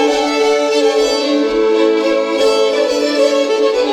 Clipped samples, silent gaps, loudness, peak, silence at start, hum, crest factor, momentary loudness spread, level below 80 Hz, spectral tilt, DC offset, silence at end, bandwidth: under 0.1%; none; -13 LUFS; -2 dBFS; 0 s; none; 10 dB; 2 LU; -48 dBFS; -2 dB/octave; under 0.1%; 0 s; 14 kHz